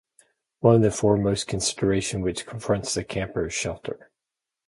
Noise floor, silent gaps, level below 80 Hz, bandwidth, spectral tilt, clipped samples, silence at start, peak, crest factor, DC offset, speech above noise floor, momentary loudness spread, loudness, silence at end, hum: -87 dBFS; none; -48 dBFS; 11.5 kHz; -5 dB/octave; under 0.1%; 0.6 s; -4 dBFS; 20 dB; under 0.1%; 63 dB; 12 LU; -24 LUFS; 0.7 s; none